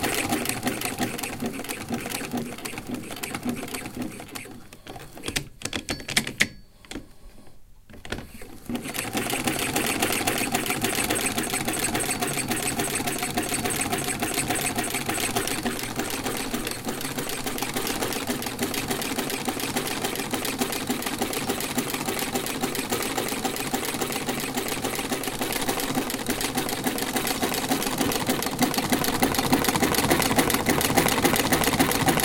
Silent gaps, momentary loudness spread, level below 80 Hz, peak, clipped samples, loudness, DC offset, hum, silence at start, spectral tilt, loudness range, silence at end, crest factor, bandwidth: none; 11 LU; -46 dBFS; -2 dBFS; under 0.1%; -26 LUFS; under 0.1%; none; 0 s; -3 dB/octave; 8 LU; 0 s; 26 dB; 17 kHz